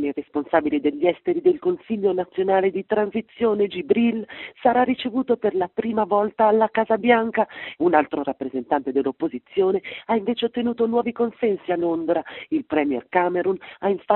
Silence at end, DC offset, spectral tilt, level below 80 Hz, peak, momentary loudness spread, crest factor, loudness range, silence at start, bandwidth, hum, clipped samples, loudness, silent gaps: 0 s; under 0.1%; -4 dB/octave; -62 dBFS; -2 dBFS; 7 LU; 20 dB; 3 LU; 0 s; 4.2 kHz; none; under 0.1%; -22 LUFS; none